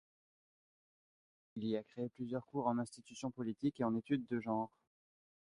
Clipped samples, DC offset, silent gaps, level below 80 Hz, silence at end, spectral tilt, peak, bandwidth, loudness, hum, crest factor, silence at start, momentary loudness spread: under 0.1%; under 0.1%; none; -78 dBFS; 0.75 s; -7 dB/octave; -22 dBFS; 11 kHz; -41 LUFS; none; 20 dB; 1.55 s; 9 LU